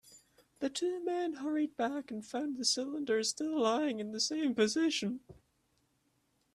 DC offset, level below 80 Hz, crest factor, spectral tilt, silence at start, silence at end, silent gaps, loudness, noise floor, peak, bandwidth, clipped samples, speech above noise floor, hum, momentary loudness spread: under 0.1%; -76 dBFS; 18 dB; -3 dB/octave; 0.1 s; 1.2 s; none; -34 LUFS; -76 dBFS; -18 dBFS; 13.5 kHz; under 0.1%; 42 dB; none; 8 LU